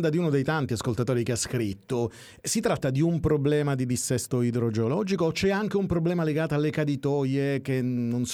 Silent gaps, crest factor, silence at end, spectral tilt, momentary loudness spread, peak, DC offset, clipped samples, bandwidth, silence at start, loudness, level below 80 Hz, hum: none; 14 dB; 0 s; -6 dB/octave; 4 LU; -12 dBFS; under 0.1%; under 0.1%; 16.5 kHz; 0 s; -26 LUFS; -50 dBFS; none